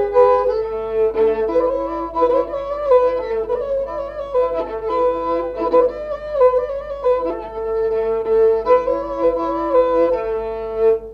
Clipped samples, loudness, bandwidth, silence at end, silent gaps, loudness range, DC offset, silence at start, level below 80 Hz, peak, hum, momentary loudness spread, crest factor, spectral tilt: under 0.1%; -18 LUFS; 5.4 kHz; 0 s; none; 2 LU; under 0.1%; 0 s; -42 dBFS; -2 dBFS; none; 8 LU; 16 dB; -7 dB/octave